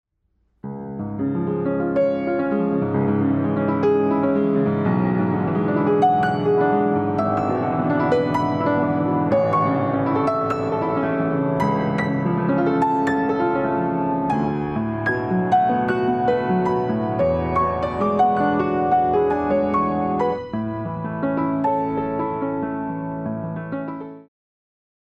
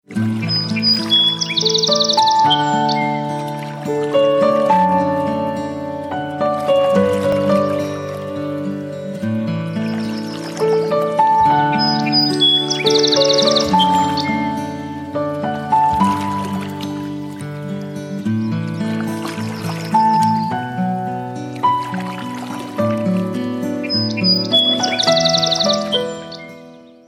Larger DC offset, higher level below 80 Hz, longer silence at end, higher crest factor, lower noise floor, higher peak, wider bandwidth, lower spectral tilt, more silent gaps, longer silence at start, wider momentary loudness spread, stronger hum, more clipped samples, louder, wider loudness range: neither; first, -48 dBFS vs -54 dBFS; first, 0.85 s vs 0.2 s; about the same, 14 dB vs 14 dB; first, -67 dBFS vs -40 dBFS; about the same, -6 dBFS vs -4 dBFS; second, 7.8 kHz vs over 20 kHz; first, -9 dB/octave vs -4.5 dB/octave; neither; first, 0.65 s vs 0.1 s; second, 8 LU vs 13 LU; neither; neither; second, -21 LUFS vs -17 LUFS; second, 4 LU vs 7 LU